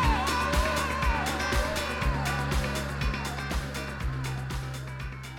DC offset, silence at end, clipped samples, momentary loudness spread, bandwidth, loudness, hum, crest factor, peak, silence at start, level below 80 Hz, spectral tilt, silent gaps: under 0.1%; 0 s; under 0.1%; 8 LU; 18 kHz; -30 LUFS; none; 16 dB; -14 dBFS; 0 s; -34 dBFS; -4.5 dB/octave; none